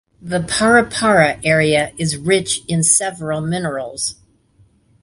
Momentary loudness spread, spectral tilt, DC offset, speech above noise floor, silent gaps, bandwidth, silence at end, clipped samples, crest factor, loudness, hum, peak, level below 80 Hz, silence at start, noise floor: 10 LU; -3.5 dB/octave; under 0.1%; 38 dB; none; 11.5 kHz; 0.9 s; under 0.1%; 18 dB; -16 LUFS; none; 0 dBFS; -48 dBFS; 0.25 s; -54 dBFS